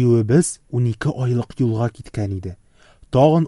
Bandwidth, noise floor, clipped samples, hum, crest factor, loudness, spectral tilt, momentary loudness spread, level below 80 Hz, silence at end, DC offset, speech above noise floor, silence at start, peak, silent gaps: 11.5 kHz; -49 dBFS; under 0.1%; none; 16 dB; -20 LUFS; -7 dB/octave; 11 LU; -46 dBFS; 0 s; under 0.1%; 31 dB; 0 s; -4 dBFS; none